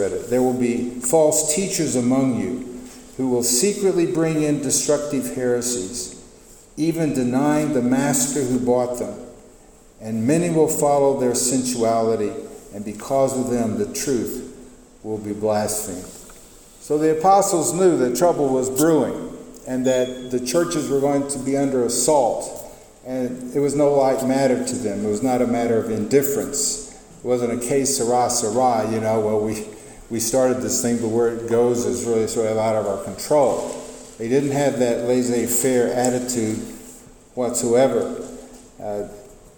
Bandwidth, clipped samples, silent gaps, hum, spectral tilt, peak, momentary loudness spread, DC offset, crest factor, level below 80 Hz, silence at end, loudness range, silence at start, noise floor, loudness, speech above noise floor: 19 kHz; under 0.1%; none; none; -4.5 dB/octave; -2 dBFS; 15 LU; under 0.1%; 18 dB; -50 dBFS; 0.25 s; 3 LU; 0 s; -48 dBFS; -20 LUFS; 28 dB